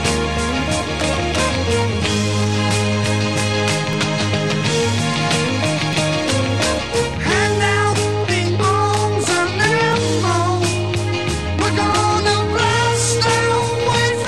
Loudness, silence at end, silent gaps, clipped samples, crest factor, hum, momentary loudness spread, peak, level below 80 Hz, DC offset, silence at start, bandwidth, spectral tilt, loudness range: -17 LUFS; 0 s; none; under 0.1%; 14 dB; none; 4 LU; -2 dBFS; -36 dBFS; 0.9%; 0 s; 12.5 kHz; -4.5 dB/octave; 1 LU